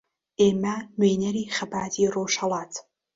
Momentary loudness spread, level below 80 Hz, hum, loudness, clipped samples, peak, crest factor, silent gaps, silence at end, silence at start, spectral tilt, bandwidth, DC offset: 11 LU; -62 dBFS; none; -25 LUFS; under 0.1%; -8 dBFS; 18 dB; none; 0.35 s; 0.4 s; -4.5 dB/octave; 7.8 kHz; under 0.1%